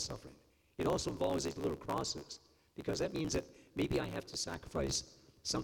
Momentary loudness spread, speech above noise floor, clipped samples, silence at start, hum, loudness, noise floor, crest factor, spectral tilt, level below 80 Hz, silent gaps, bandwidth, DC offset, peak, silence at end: 15 LU; 25 dB; under 0.1%; 0 s; none; -38 LUFS; -63 dBFS; 16 dB; -4 dB/octave; -56 dBFS; none; 18 kHz; under 0.1%; -22 dBFS; 0 s